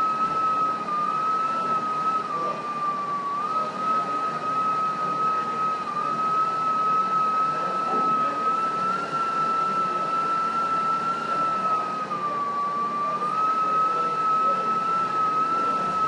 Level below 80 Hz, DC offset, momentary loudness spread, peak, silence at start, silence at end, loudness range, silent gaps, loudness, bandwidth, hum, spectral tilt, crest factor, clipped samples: -70 dBFS; under 0.1%; 4 LU; -14 dBFS; 0 s; 0 s; 2 LU; none; -24 LUFS; 11 kHz; none; -5 dB/octave; 10 dB; under 0.1%